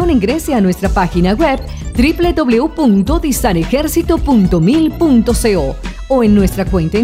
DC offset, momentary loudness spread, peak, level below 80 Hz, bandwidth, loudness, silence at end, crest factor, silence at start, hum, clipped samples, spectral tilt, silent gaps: under 0.1%; 4 LU; 0 dBFS; -22 dBFS; 16 kHz; -13 LUFS; 0 s; 12 dB; 0 s; none; under 0.1%; -6 dB/octave; none